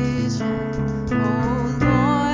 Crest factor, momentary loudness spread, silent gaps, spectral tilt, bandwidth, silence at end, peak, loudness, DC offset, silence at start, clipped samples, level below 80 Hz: 14 dB; 6 LU; none; -7 dB/octave; 7.6 kHz; 0 s; -6 dBFS; -21 LUFS; under 0.1%; 0 s; under 0.1%; -36 dBFS